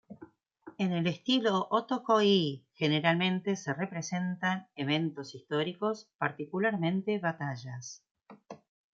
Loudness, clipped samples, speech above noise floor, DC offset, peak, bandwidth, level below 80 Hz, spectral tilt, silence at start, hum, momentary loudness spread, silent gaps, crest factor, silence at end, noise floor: -31 LUFS; under 0.1%; 25 dB; under 0.1%; -10 dBFS; 7.6 kHz; -78 dBFS; -5.5 dB/octave; 0.1 s; none; 15 LU; 6.15-6.19 s, 8.11-8.15 s; 22 dB; 0.4 s; -56 dBFS